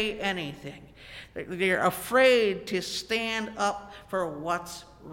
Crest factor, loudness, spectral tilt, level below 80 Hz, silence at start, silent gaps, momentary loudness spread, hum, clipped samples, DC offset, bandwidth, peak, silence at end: 18 dB; -27 LUFS; -3.5 dB/octave; -58 dBFS; 0 s; none; 21 LU; none; under 0.1%; under 0.1%; 17 kHz; -10 dBFS; 0 s